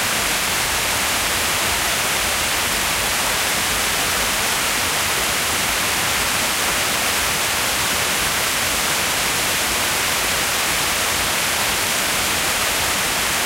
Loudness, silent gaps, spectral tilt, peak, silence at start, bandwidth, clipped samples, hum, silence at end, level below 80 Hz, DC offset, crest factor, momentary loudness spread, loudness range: -17 LUFS; none; -0.5 dB/octave; -6 dBFS; 0 s; 16 kHz; under 0.1%; none; 0 s; -40 dBFS; under 0.1%; 14 dB; 0 LU; 0 LU